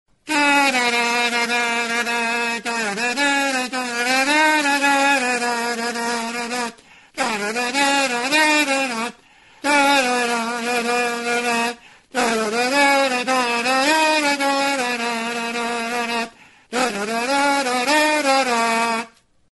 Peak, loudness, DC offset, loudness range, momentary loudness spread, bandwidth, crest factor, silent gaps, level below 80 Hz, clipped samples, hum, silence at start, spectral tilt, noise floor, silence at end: -2 dBFS; -19 LUFS; under 0.1%; 3 LU; 9 LU; 12 kHz; 18 dB; none; -66 dBFS; under 0.1%; none; 0.25 s; -1.5 dB/octave; -50 dBFS; 0.5 s